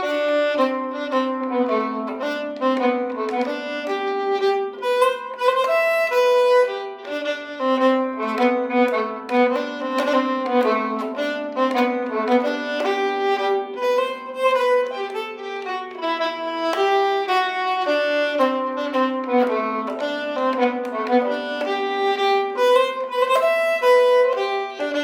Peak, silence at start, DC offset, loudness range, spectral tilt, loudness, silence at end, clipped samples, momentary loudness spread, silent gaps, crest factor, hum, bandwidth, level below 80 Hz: -4 dBFS; 0 s; under 0.1%; 3 LU; -3.5 dB/octave; -21 LUFS; 0 s; under 0.1%; 8 LU; none; 16 dB; none; 16 kHz; -72 dBFS